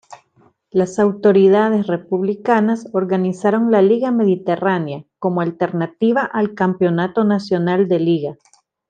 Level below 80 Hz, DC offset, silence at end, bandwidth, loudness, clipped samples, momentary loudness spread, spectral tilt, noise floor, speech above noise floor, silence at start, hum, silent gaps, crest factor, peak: -64 dBFS; under 0.1%; 0.55 s; 9 kHz; -17 LUFS; under 0.1%; 7 LU; -8 dB/octave; -56 dBFS; 40 dB; 0.1 s; none; none; 14 dB; -2 dBFS